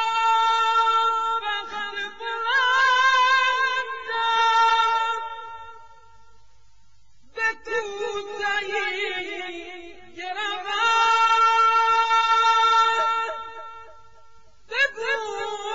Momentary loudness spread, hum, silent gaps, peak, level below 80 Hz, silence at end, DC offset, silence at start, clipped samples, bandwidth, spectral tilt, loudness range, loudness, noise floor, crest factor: 17 LU; none; none; -10 dBFS; -62 dBFS; 0 s; 0.5%; 0 s; under 0.1%; 7.8 kHz; 0 dB/octave; 9 LU; -21 LUFS; -61 dBFS; 14 dB